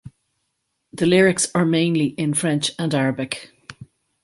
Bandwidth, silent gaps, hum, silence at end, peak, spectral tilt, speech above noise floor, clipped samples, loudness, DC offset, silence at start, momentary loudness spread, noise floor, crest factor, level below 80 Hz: 11.5 kHz; none; none; 0.4 s; -4 dBFS; -4.5 dB/octave; 55 dB; under 0.1%; -20 LUFS; under 0.1%; 0.05 s; 14 LU; -74 dBFS; 18 dB; -58 dBFS